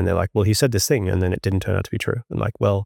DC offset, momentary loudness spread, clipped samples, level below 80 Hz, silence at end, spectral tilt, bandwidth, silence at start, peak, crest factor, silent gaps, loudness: under 0.1%; 7 LU; under 0.1%; -46 dBFS; 0 s; -5.5 dB/octave; 17 kHz; 0 s; -6 dBFS; 14 dB; none; -21 LUFS